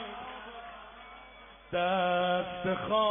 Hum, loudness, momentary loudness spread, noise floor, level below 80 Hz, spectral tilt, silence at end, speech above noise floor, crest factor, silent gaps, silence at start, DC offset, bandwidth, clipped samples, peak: none; -31 LUFS; 21 LU; -52 dBFS; -60 dBFS; -1.5 dB/octave; 0 s; 23 dB; 18 dB; none; 0 s; under 0.1%; 3.7 kHz; under 0.1%; -16 dBFS